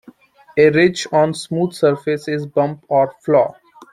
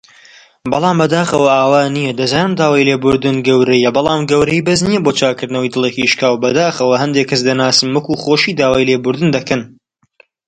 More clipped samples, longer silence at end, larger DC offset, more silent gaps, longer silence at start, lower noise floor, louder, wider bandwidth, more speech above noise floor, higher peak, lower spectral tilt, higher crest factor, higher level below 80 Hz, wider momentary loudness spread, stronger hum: neither; second, 0.1 s vs 0.8 s; neither; neither; about the same, 0.55 s vs 0.65 s; second, -46 dBFS vs -51 dBFS; second, -17 LUFS vs -13 LUFS; first, 12 kHz vs 10.5 kHz; second, 29 dB vs 39 dB; about the same, -2 dBFS vs 0 dBFS; first, -6 dB/octave vs -4.5 dB/octave; about the same, 16 dB vs 14 dB; second, -58 dBFS vs -48 dBFS; first, 8 LU vs 5 LU; neither